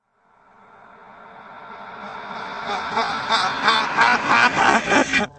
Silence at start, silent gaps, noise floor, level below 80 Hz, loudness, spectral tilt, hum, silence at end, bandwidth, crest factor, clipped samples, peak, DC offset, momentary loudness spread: 1.1 s; none; -58 dBFS; -56 dBFS; -18 LUFS; -2.5 dB/octave; none; 0.1 s; 8.8 kHz; 20 dB; under 0.1%; 0 dBFS; under 0.1%; 21 LU